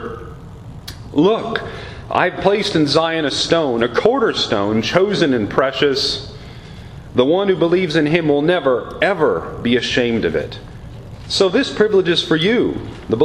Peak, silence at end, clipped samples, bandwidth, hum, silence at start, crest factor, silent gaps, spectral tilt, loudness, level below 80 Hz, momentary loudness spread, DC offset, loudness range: 0 dBFS; 0 s; under 0.1%; 13.5 kHz; none; 0 s; 18 dB; none; -5 dB/octave; -16 LUFS; -42 dBFS; 18 LU; under 0.1%; 2 LU